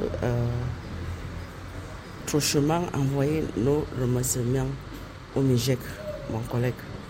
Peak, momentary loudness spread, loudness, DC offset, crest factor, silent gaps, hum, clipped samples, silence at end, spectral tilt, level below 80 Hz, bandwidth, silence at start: -12 dBFS; 15 LU; -27 LUFS; under 0.1%; 16 dB; none; none; under 0.1%; 0 s; -5.5 dB/octave; -42 dBFS; 16.5 kHz; 0 s